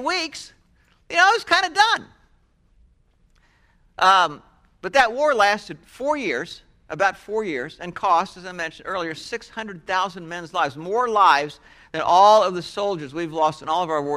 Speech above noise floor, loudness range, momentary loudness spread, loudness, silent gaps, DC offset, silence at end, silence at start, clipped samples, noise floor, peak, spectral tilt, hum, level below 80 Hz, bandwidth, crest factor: 39 dB; 6 LU; 16 LU; -20 LUFS; none; under 0.1%; 0 s; 0 s; under 0.1%; -60 dBFS; -2 dBFS; -3 dB/octave; none; -58 dBFS; 14 kHz; 20 dB